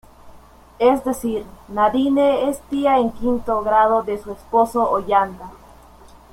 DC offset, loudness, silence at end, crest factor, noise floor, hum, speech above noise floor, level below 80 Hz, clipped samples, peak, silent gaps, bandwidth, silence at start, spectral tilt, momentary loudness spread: under 0.1%; -19 LUFS; 0.75 s; 18 dB; -45 dBFS; none; 27 dB; -46 dBFS; under 0.1%; -2 dBFS; none; 16 kHz; 0.25 s; -5.5 dB/octave; 11 LU